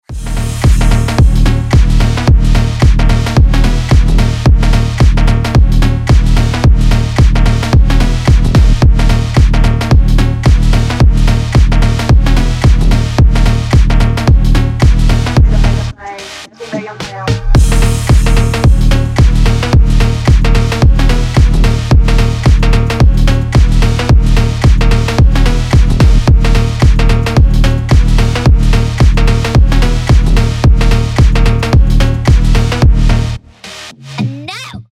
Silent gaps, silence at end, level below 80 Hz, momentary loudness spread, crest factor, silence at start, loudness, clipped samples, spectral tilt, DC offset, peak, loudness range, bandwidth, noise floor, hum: none; 0.1 s; -10 dBFS; 4 LU; 8 dB; 0.1 s; -11 LUFS; under 0.1%; -6.5 dB/octave; 0.6%; 0 dBFS; 2 LU; 12.5 kHz; -30 dBFS; none